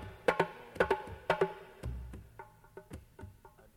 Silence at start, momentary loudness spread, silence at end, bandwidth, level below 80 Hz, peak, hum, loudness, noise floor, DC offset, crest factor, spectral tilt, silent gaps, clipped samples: 0 s; 21 LU; 0.3 s; 16.5 kHz; -52 dBFS; -14 dBFS; none; -35 LUFS; -58 dBFS; under 0.1%; 24 dB; -6 dB/octave; none; under 0.1%